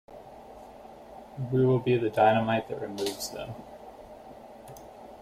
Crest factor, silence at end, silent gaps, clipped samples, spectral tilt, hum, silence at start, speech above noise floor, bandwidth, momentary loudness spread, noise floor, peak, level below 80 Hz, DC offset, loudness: 20 dB; 0 s; none; under 0.1%; -6 dB/octave; none; 0.1 s; 21 dB; 16 kHz; 25 LU; -48 dBFS; -10 dBFS; -60 dBFS; under 0.1%; -27 LUFS